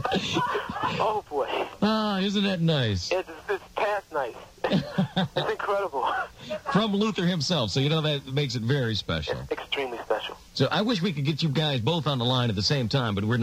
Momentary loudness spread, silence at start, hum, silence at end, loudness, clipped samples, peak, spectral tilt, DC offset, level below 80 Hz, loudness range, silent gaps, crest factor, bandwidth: 6 LU; 0 s; none; 0 s; -27 LUFS; under 0.1%; -10 dBFS; -5.5 dB/octave; under 0.1%; -56 dBFS; 2 LU; none; 16 dB; 16 kHz